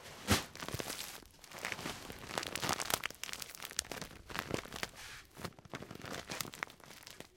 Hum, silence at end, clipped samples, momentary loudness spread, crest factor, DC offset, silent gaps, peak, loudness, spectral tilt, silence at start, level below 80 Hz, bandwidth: none; 0 s; under 0.1%; 15 LU; 34 dB; under 0.1%; none; -8 dBFS; -41 LUFS; -2.5 dB/octave; 0 s; -60 dBFS; 17 kHz